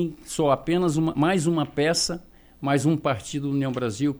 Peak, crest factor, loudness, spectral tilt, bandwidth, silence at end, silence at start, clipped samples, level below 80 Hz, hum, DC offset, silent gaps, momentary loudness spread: -10 dBFS; 14 dB; -24 LUFS; -5 dB/octave; over 20 kHz; 0 s; 0 s; under 0.1%; -52 dBFS; none; under 0.1%; none; 6 LU